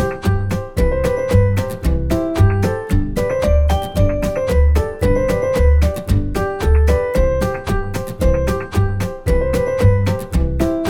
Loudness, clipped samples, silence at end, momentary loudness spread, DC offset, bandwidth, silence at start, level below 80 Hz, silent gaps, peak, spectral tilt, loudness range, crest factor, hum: -17 LUFS; under 0.1%; 0 s; 5 LU; under 0.1%; 16.5 kHz; 0 s; -20 dBFS; none; 0 dBFS; -7.5 dB/octave; 2 LU; 14 dB; none